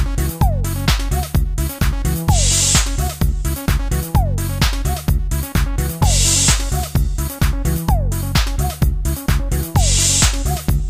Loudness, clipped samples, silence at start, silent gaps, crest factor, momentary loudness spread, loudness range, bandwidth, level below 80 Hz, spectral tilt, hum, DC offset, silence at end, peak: -17 LUFS; under 0.1%; 0 s; none; 16 dB; 8 LU; 2 LU; 16 kHz; -20 dBFS; -3.5 dB/octave; none; under 0.1%; 0 s; 0 dBFS